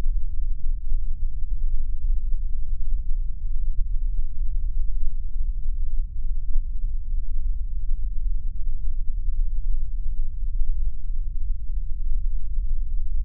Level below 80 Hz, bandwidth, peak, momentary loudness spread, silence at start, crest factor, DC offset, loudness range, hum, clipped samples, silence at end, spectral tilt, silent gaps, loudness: -22 dBFS; 0.3 kHz; -8 dBFS; 2 LU; 0 s; 10 dB; under 0.1%; 1 LU; none; under 0.1%; 0 s; -15 dB/octave; none; -32 LUFS